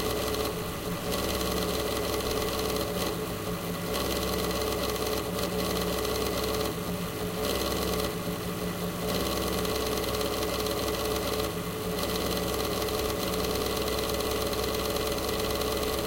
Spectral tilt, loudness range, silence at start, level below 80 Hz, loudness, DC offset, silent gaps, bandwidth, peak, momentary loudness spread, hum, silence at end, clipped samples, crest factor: -4 dB/octave; 1 LU; 0 s; -42 dBFS; -30 LUFS; under 0.1%; none; 17 kHz; -14 dBFS; 4 LU; none; 0 s; under 0.1%; 14 dB